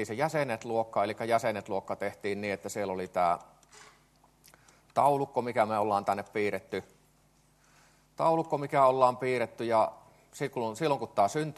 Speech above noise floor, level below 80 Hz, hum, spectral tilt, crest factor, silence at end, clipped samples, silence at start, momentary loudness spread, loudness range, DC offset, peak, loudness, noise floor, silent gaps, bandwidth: 36 dB; -72 dBFS; none; -5.5 dB/octave; 22 dB; 0.05 s; under 0.1%; 0 s; 9 LU; 4 LU; under 0.1%; -10 dBFS; -30 LUFS; -65 dBFS; none; 13 kHz